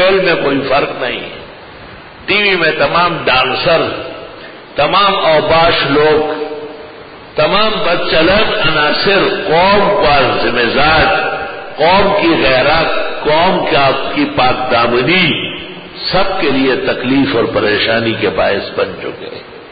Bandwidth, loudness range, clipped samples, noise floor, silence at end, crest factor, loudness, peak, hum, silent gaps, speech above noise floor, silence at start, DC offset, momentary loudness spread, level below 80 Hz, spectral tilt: 5 kHz; 3 LU; under 0.1%; -33 dBFS; 0 s; 12 dB; -11 LUFS; 0 dBFS; none; none; 21 dB; 0 s; under 0.1%; 16 LU; -36 dBFS; -10.5 dB/octave